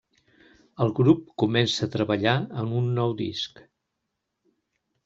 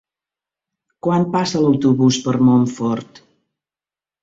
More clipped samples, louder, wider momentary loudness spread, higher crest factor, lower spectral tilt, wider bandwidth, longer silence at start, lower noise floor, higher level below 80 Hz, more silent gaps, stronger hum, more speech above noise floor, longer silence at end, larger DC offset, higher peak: neither; second, -25 LUFS vs -17 LUFS; about the same, 8 LU vs 8 LU; first, 22 dB vs 16 dB; about the same, -6.5 dB/octave vs -6.5 dB/octave; about the same, 7.8 kHz vs 7.8 kHz; second, 0.8 s vs 1.05 s; second, -81 dBFS vs under -90 dBFS; about the same, -62 dBFS vs -58 dBFS; neither; neither; second, 57 dB vs over 74 dB; first, 1.6 s vs 1.2 s; neither; about the same, -4 dBFS vs -4 dBFS